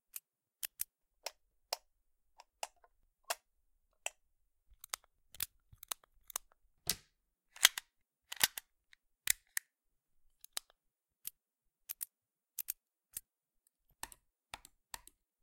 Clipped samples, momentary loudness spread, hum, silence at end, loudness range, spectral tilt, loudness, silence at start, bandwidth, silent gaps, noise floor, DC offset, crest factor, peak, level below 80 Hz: under 0.1%; 18 LU; none; 0.45 s; 13 LU; 2 dB/octave; -40 LUFS; 0.15 s; 17 kHz; none; -87 dBFS; under 0.1%; 40 dB; -6 dBFS; -74 dBFS